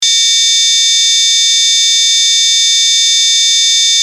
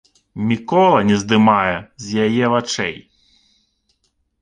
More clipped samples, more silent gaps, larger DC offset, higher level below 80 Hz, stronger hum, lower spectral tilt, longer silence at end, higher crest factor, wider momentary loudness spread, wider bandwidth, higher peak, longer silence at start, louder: neither; neither; neither; second, -82 dBFS vs -52 dBFS; neither; second, 10 dB/octave vs -5.5 dB/octave; second, 0 s vs 1.45 s; second, 10 dB vs 16 dB; second, 0 LU vs 12 LU; first, 16 kHz vs 9.6 kHz; about the same, 0 dBFS vs -2 dBFS; second, 0 s vs 0.35 s; first, -6 LUFS vs -17 LUFS